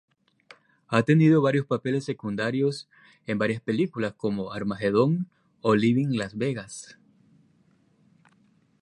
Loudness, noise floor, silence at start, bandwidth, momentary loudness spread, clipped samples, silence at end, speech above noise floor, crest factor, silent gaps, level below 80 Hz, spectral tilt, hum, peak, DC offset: -25 LUFS; -63 dBFS; 0.9 s; 11.5 kHz; 13 LU; under 0.1%; 1.95 s; 39 dB; 22 dB; none; -64 dBFS; -7 dB/octave; none; -6 dBFS; under 0.1%